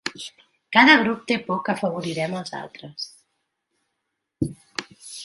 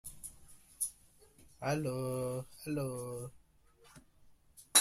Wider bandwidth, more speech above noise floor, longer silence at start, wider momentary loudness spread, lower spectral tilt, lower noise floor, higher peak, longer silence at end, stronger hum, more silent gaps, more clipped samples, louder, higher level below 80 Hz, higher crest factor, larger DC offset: second, 11.5 kHz vs 16 kHz; first, 58 dB vs 27 dB; about the same, 0.05 s vs 0.05 s; first, 22 LU vs 14 LU; first, -4.5 dB/octave vs -3 dB/octave; first, -79 dBFS vs -65 dBFS; first, -2 dBFS vs -12 dBFS; about the same, 0 s vs 0 s; neither; neither; neither; first, -20 LUFS vs -37 LUFS; first, -58 dBFS vs -66 dBFS; about the same, 24 dB vs 28 dB; neither